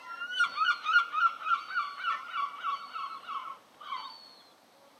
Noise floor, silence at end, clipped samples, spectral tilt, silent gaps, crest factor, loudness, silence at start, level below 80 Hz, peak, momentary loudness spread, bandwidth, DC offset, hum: -60 dBFS; 0.55 s; under 0.1%; 1 dB/octave; none; 18 dB; -31 LUFS; 0 s; under -90 dBFS; -14 dBFS; 15 LU; 13.5 kHz; under 0.1%; none